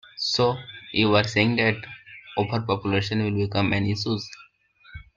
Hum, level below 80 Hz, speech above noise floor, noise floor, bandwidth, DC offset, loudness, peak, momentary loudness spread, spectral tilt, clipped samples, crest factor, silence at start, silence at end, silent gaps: none; -54 dBFS; 32 dB; -55 dBFS; 7.6 kHz; under 0.1%; -24 LUFS; -6 dBFS; 13 LU; -5.5 dB/octave; under 0.1%; 20 dB; 0.15 s; 0.15 s; none